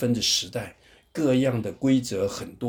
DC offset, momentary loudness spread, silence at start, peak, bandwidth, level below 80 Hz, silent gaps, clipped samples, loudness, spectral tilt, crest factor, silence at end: under 0.1%; 13 LU; 0 s; -10 dBFS; 19.5 kHz; -56 dBFS; none; under 0.1%; -25 LUFS; -4.5 dB/octave; 14 dB; 0 s